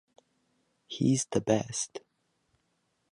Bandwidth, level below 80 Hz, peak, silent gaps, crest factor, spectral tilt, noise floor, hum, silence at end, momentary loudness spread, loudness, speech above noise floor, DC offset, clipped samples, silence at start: 11.5 kHz; -66 dBFS; -12 dBFS; none; 22 dB; -5 dB/octave; -76 dBFS; none; 1.15 s; 14 LU; -30 LUFS; 47 dB; under 0.1%; under 0.1%; 0.9 s